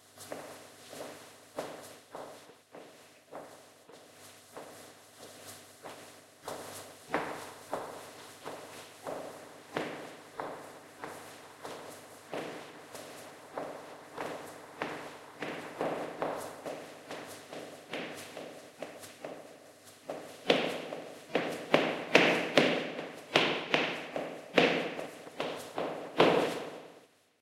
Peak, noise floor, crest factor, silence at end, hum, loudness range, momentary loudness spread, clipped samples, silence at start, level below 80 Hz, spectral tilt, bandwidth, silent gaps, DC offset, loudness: -4 dBFS; -60 dBFS; 34 dB; 0.35 s; none; 19 LU; 22 LU; under 0.1%; 0.05 s; -78 dBFS; -3.5 dB/octave; 16 kHz; none; under 0.1%; -34 LUFS